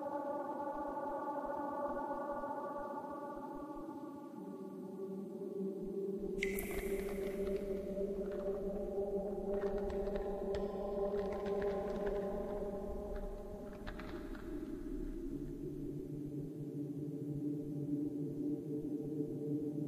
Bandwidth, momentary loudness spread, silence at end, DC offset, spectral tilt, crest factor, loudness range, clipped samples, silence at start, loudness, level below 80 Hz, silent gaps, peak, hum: 15.5 kHz; 8 LU; 0 s; under 0.1%; -7.5 dB/octave; 20 dB; 6 LU; under 0.1%; 0 s; -42 LUFS; -54 dBFS; none; -20 dBFS; none